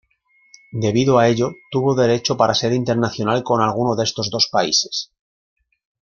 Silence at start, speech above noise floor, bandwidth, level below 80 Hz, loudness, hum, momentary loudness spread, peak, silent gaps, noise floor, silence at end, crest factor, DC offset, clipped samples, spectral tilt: 0.75 s; 42 dB; 7.2 kHz; -56 dBFS; -18 LUFS; none; 7 LU; -2 dBFS; none; -59 dBFS; 1.1 s; 18 dB; under 0.1%; under 0.1%; -4.5 dB/octave